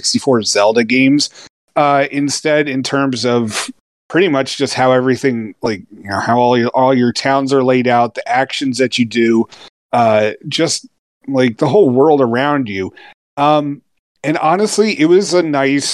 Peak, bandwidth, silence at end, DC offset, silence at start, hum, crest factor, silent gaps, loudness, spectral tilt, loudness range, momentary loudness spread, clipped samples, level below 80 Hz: 0 dBFS; 12.5 kHz; 0 s; under 0.1%; 0.05 s; none; 14 dB; 1.50-1.68 s, 3.80-4.10 s, 9.69-9.89 s, 10.99-11.21 s, 13.14-13.37 s, 13.99-14.15 s; -14 LUFS; -4.5 dB/octave; 2 LU; 10 LU; under 0.1%; -64 dBFS